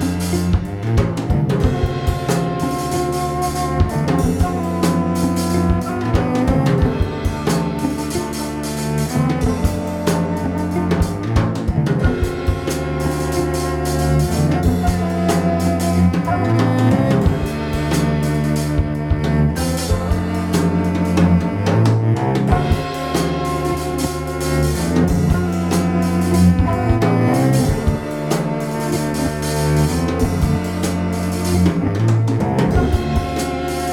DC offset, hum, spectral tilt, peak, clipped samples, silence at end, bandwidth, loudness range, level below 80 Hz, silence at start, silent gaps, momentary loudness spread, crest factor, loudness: under 0.1%; none; -6.5 dB/octave; -2 dBFS; under 0.1%; 0 s; 17 kHz; 3 LU; -28 dBFS; 0 s; none; 5 LU; 16 dB; -18 LUFS